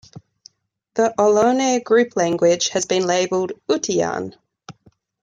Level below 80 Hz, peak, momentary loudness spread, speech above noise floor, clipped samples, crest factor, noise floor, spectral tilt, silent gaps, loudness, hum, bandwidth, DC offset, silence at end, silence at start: -64 dBFS; -4 dBFS; 8 LU; 39 dB; under 0.1%; 16 dB; -57 dBFS; -3.5 dB/octave; none; -19 LUFS; none; 9.4 kHz; under 0.1%; 0.5 s; 0.15 s